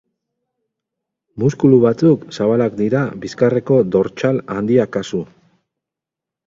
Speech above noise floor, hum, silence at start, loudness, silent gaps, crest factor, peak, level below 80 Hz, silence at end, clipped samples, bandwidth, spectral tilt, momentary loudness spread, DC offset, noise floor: 70 dB; none; 1.35 s; -16 LUFS; none; 18 dB; 0 dBFS; -54 dBFS; 1.2 s; under 0.1%; 7.6 kHz; -8 dB/octave; 10 LU; under 0.1%; -85 dBFS